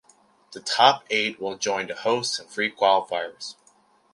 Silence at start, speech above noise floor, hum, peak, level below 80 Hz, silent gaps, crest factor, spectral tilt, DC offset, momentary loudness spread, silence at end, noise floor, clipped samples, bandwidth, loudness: 0.5 s; 36 dB; none; -2 dBFS; -74 dBFS; none; 24 dB; -2 dB/octave; under 0.1%; 16 LU; 0.6 s; -60 dBFS; under 0.1%; 11.5 kHz; -23 LUFS